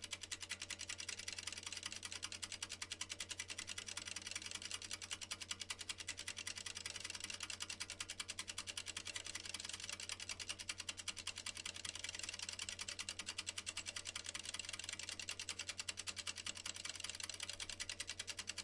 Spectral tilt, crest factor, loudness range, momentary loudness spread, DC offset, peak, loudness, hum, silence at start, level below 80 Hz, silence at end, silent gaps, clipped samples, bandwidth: 0 dB/octave; 22 dB; 1 LU; 1 LU; under 0.1%; -26 dBFS; -46 LUFS; none; 0 s; -72 dBFS; 0 s; none; under 0.1%; 11.5 kHz